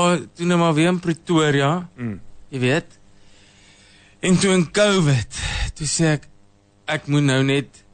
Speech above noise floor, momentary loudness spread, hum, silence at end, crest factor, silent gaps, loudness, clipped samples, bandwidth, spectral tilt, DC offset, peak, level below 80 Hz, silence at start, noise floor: 34 dB; 10 LU; none; 0.3 s; 14 dB; none; -20 LUFS; under 0.1%; 9.6 kHz; -5 dB/octave; under 0.1%; -6 dBFS; -40 dBFS; 0 s; -54 dBFS